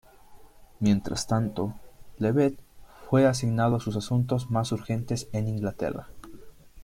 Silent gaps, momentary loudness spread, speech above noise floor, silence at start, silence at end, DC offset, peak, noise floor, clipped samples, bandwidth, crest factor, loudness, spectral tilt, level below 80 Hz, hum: none; 10 LU; 24 dB; 0.3 s; 0 s; under 0.1%; -10 dBFS; -50 dBFS; under 0.1%; 15.5 kHz; 18 dB; -27 LUFS; -6.5 dB/octave; -50 dBFS; none